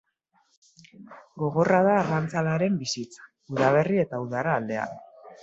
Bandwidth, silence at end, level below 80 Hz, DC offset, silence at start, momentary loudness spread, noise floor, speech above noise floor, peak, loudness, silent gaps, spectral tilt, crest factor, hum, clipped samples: 8 kHz; 0.1 s; -66 dBFS; under 0.1%; 1 s; 14 LU; -69 dBFS; 44 dB; -6 dBFS; -25 LUFS; none; -6 dB/octave; 20 dB; none; under 0.1%